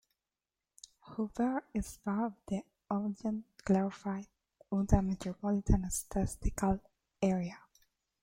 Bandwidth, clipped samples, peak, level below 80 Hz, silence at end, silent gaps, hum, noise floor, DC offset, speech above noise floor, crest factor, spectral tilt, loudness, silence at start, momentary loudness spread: 16.5 kHz; under 0.1%; -12 dBFS; -44 dBFS; 0.65 s; none; none; under -90 dBFS; under 0.1%; over 57 dB; 22 dB; -6.5 dB/octave; -35 LUFS; 1.05 s; 10 LU